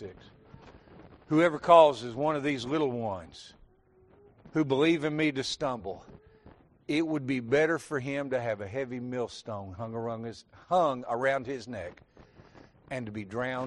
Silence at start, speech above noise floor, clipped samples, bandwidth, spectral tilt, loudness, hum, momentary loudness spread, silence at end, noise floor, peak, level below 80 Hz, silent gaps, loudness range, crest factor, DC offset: 0 s; 33 dB; under 0.1%; 11 kHz; -6 dB/octave; -29 LUFS; none; 15 LU; 0 s; -62 dBFS; -6 dBFS; -64 dBFS; none; 6 LU; 24 dB; under 0.1%